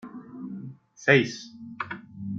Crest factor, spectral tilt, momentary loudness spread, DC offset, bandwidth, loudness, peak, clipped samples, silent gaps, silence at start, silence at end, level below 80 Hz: 26 dB; -5.5 dB/octave; 22 LU; under 0.1%; 7.6 kHz; -25 LUFS; -4 dBFS; under 0.1%; none; 0.05 s; 0 s; -68 dBFS